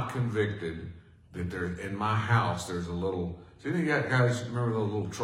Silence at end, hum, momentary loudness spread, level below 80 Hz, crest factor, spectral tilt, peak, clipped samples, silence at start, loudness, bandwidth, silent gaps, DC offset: 0 s; none; 12 LU; -58 dBFS; 18 dB; -6.5 dB/octave; -12 dBFS; under 0.1%; 0 s; -30 LUFS; 12.5 kHz; none; under 0.1%